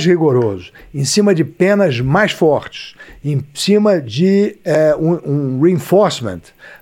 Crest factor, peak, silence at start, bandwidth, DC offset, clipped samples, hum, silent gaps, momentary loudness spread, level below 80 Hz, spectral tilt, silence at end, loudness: 14 dB; -2 dBFS; 0 s; 16.5 kHz; under 0.1%; under 0.1%; none; none; 14 LU; -48 dBFS; -6 dB/octave; 0.05 s; -14 LUFS